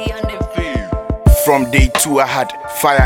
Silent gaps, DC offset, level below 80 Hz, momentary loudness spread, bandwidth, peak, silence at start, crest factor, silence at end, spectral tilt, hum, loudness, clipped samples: none; under 0.1%; -20 dBFS; 9 LU; 17.5 kHz; 0 dBFS; 0 s; 14 dB; 0 s; -4.5 dB/octave; none; -15 LUFS; under 0.1%